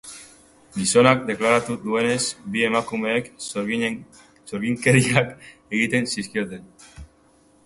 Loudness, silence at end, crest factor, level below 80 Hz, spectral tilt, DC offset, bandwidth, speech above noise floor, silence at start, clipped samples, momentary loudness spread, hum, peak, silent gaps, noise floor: -21 LUFS; 0.6 s; 24 dB; -54 dBFS; -4.5 dB/octave; under 0.1%; 11.5 kHz; 35 dB; 0.05 s; under 0.1%; 16 LU; none; 0 dBFS; none; -57 dBFS